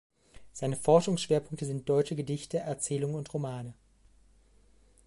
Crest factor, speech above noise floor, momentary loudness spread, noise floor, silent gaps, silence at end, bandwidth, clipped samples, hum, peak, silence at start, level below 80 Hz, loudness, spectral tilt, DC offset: 22 dB; 32 dB; 13 LU; -62 dBFS; none; 1.35 s; 11.5 kHz; under 0.1%; none; -10 dBFS; 0.35 s; -64 dBFS; -31 LUFS; -5.5 dB/octave; under 0.1%